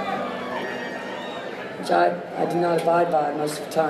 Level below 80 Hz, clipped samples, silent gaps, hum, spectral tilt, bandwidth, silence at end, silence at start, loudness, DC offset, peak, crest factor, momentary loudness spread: -68 dBFS; under 0.1%; none; none; -5 dB/octave; 15 kHz; 0 s; 0 s; -24 LUFS; under 0.1%; -8 dBFS; 16 dB; 11 LU